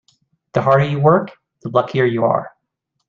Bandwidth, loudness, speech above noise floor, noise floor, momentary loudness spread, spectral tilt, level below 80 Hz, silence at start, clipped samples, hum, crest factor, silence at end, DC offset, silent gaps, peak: 7 kHz; -17 LUFS; 59 dB; -74 dBFS; 17 LU; -8.5 dB/octave; -54 dBFS; 0.55 s; under 0.1%; none; 16 dB; 0.6 s; under 0.1%; none; -2 dBFS